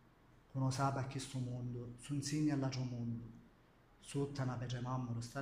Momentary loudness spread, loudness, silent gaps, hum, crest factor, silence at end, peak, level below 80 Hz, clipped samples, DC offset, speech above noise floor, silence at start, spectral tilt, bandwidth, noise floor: 11 LU; -41 LUFS; none; none; 16 dB; 0 s; -24 dBFS; -64 dBFS; under 0.1%; under 0.1%; 27 dB; 0.55 s; -6 dB/octave; 15 kHz; -67 dBFS